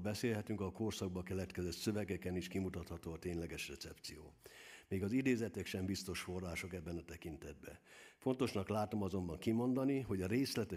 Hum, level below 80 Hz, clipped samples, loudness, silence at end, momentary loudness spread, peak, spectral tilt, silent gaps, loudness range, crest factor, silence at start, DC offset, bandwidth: none; -66 dBFS; under 0.1%; -41 LUFS; 0 s; 14 LU; -22 dBFS; -5.5 dB/octave; none; 4 LU; 18 dB; 0 s; under 0.1%; 15.5 kHz